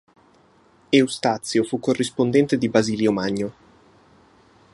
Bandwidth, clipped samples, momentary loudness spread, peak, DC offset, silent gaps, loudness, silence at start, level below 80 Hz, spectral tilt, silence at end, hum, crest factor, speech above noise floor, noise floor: 11.5 kHz; under 0.1%; 5 LU; -2 dBFS; under 0.1%; none; -21 LUFS; 0.9 s; -60 dBFS; -5 dB/octave; 1.25 s; none; 20 dB; 36 dB; -56 dBFS